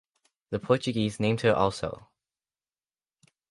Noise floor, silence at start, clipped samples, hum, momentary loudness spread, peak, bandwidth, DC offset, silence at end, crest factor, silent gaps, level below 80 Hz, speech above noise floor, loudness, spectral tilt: under -90 dBFS; 0.5 s; under 0.1%; none; 12 LU; -8 dBFS; 11.5 kHz; under 0.1%; 1.5 s; 22 dB; none; -56 dBFS; over 64 dB; -27 LUFS; -6 dB/octave